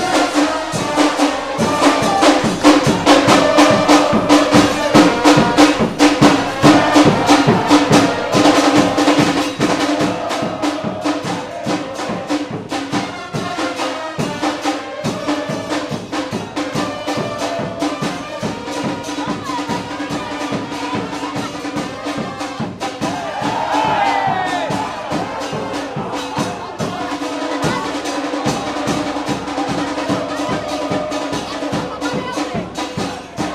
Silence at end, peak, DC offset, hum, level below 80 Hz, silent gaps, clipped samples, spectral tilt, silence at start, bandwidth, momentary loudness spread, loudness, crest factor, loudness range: 0 s; 0 dBFS; under 0.1%; none; -46 dBFS; none; under 0.1%; -4.5 dB/octave; 0 s; 14.5 kHz; 12 LU; -16 LUFS; 16 dB; 11 LU